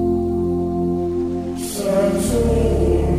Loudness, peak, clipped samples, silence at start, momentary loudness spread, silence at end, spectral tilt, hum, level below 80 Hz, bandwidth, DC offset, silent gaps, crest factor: -20 LUFS; -6 dBFS; under 0.1%; 0 s; 6 LU; 0 s; -7 dB/octave; none; -28 dBFS; 15.5 kHz; 0.4%; none; 12 dB